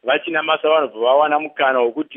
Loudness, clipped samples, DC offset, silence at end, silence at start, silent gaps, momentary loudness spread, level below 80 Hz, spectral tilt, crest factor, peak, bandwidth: -17 LUFS; under 0.1%; under 0.1%; 0 s; 0.05 s; none; 3 LU; -82 dBFS; -7.5 dB/octave; 14 dB; -2 dBFS; 3.8 kHz